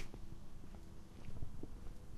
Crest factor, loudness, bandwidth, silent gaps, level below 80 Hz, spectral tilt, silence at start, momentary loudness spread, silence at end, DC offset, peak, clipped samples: 12 dB; -55 LUFS; 12 kHz; none; -52 dBFS; -6.5 dB/octave; 0 s; 5 LU; 0 s; under 0.1%; -32 dBFS; under 0.1%